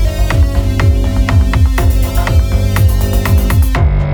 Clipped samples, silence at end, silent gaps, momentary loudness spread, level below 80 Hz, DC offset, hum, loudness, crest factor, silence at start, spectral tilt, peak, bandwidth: under 0.1%; 0 s; none; 2 LU; -12 dBFS; under 0.1%; none; -12 LUFS; 10 dB; 0 s; -6.5 dB/octave; 0 dBFS; over 20 kHz